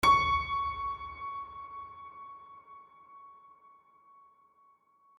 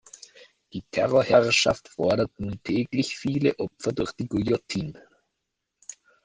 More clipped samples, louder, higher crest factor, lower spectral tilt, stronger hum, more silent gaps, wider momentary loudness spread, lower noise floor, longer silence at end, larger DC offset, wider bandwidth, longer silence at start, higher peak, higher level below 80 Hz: neither; second, -32 LUFS vs -25 LUFS; about the same, 22 dB vs 22 dB; second, -3 dB/octave vs -5 dB/octave; neither; neither; about the same, 26 LU vs 24 LU; second, -66 dBFS vs -81 dBFS; first, 1.85 s vs 0.3 s; neither; first, 15.5 kHz vs 10 kHz; second, 0 s vs 0.75 s; second, -12 dBFS vs -4 dBFS; about the same, -54 dBFS vs -54 dBFS